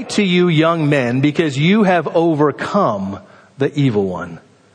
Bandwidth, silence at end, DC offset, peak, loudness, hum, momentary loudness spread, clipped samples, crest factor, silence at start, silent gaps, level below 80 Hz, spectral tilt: 10 kHz; 0.35 s; under 0.1%; -2 dBFS; -15 LUFS; none; 10 LU; under 0.1%; 14 dB; 0 s; none; -58 dBFS; -6.5 dB/octave